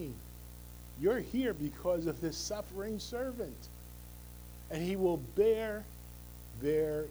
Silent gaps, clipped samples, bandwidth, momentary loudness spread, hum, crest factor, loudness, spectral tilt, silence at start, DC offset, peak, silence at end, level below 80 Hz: none; under 0.1%; over 20 kHz; 19 LU; 60 Hz at -50 dBFS; 18 dB; -35 LUFS; -5.5 dB/octave; 0 s; under 0.1%; -18 dBFS; 0 s; -52 dBFS